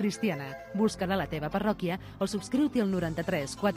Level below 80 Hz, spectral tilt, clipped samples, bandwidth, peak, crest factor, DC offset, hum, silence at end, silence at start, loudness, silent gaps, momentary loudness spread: -54 dBFS; -6 dB/octave; under 0.1%; 15.5 kHz; -14 dBFS; 16 dB; under 0.1%; none; 0 s; 0 s; -31 LUFS; none; 6 LU